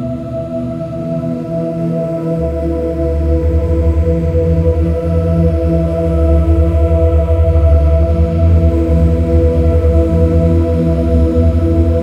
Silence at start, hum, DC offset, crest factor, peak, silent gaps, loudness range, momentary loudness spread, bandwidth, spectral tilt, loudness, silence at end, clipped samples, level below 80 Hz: 0 s; none; under 0.1%; 12 dB; 0 dBFS; none; 4 LU; 7 LU; 4.2 kHz; -10.5 dB/octave; -13 LUFS; 0 s; under 0.1%; -16 dBFS